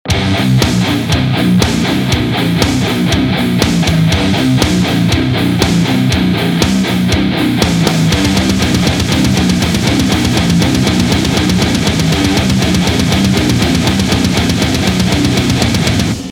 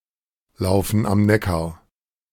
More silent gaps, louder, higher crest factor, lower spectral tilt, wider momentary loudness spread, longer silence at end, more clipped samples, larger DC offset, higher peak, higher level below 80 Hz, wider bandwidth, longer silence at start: neither; first, -12 LUFS vs -20 LUFS; second, 12 dB vs 18 dB; second, -5 dB/octave vs -6.5 dB/octave; second, 2 LU vs 9 LU; second, 0 s vs 0.6 s; neither; neither; first, 0 dBFS vs -4 dBFS; first, -26 dBFS vs -42 dBFS; first, over 20 kHz vs 17.5 kHz; second, 0.05 s vs 0.6 s